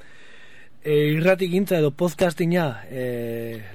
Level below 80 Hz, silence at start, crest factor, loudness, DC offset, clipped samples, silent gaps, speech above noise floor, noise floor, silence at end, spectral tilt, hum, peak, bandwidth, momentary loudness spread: -58 dBFS; 0.85 s; 16 dB; -22 LUFS; 0.9%; under 0.1%; none; 28 dB; -50 dBFS; 0 s; -6.5 dB/octave; none; -6 dBFS; 17 kHz; 11 LU